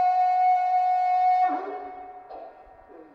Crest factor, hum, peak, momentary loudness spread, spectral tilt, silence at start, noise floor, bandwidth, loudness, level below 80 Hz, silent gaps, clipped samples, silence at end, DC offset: 10 dB; none; -14 dBFS; 21 LU; -4 dB/octave; 0 s; -49 dBFS; 6.2 kHz; -22 LUFS; -68 dBFS; none; under 0.1%; 0.1 s; under 0.1%